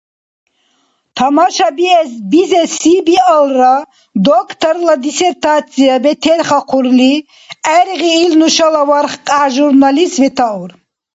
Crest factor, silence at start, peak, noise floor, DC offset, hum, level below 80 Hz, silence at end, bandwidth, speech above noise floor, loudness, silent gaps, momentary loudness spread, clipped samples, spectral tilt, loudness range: 10 dB; 1.15 s; 0 dBFS; -58 dBFS; under 0.1%; none; -56 dBFS; 0.45 s; 8 kHz; 48 dB; -10 LUFS; none; 6 LU; under 0.1%; -3.5 dB/octave; 1 LU